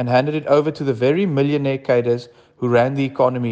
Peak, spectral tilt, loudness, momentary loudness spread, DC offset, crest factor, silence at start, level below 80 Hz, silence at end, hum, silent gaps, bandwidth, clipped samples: -4 dBFS; -8 dB/octave; -19 LUFS; 5 LU; under 0.1%; 14 dB; 0 s; -62 dBFS; 0 s; none; none; 8 kHz; under 0.1%